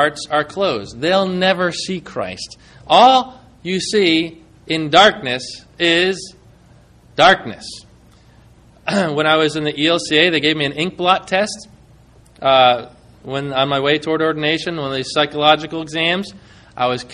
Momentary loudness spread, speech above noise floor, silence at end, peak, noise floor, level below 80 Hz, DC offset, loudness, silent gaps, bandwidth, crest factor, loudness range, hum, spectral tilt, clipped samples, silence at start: 16 LU; 31 dB; 0 s; 0 dBFS; -47 dBFS; -52 dBFS; under 0.1%; -16 LUFS; none; 11 kHz; 18 dB; 3 LU; none; -4 dB/octave; under 0.1%; 0 s